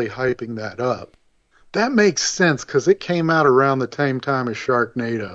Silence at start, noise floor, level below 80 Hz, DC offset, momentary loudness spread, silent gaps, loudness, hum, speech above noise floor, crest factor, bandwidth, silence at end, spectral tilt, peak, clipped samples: 0 s; -55 dBFS; -58 dBFS; under 0.1%; 9 LU; none; -19 LUFS; none; 36 dB; 16 dB; 8 kHz; 0 s; -4.5 dB/octave; -4 dBFS; under 0.1%